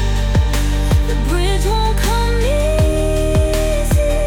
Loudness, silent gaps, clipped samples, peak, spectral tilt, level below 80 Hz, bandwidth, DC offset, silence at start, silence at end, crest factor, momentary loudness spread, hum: -17 LUFS; none; under 0.1%; -4 dBFS; -5.5 dB/octave; -16 dBFS; 16.5 kHz; under 0.1%; 0 s; 0 s; 10 dB; 2 LU; 50 Hz at -25 dBFS